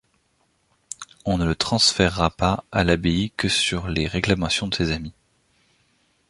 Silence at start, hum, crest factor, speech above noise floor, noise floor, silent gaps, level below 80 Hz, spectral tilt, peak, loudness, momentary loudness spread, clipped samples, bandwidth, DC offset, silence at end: 1 s; none; 22 dB; 45 dB; -67 dBFS; none; -38 dBFS; -4 dB/octave; -2 dBFS; -21 LUFS; 13 LU; under 0.1%; 11.5 kHz; under 0.1%; 1.2 s